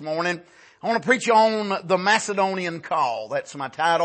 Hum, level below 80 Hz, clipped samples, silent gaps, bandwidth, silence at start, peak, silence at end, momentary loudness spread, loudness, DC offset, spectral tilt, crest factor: none; -74 dBFS; under 0.1%; none; 8.8 kHz; 0 s; -6 dBFS; 0 s; 11 LU; -22 LUFS; under 0.1%; -3.5 dB/octave; 18 dB